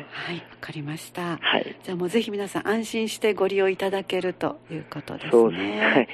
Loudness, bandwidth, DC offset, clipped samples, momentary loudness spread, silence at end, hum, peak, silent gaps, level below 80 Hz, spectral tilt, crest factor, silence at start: -25 LUFS; 13.5 kHz; under 0.1%; under 0.1%; 15 LU; 0 s; none; -4 dBFS; none; -66 dBFS; -4.5 dB/octave; 20 dB; 0 s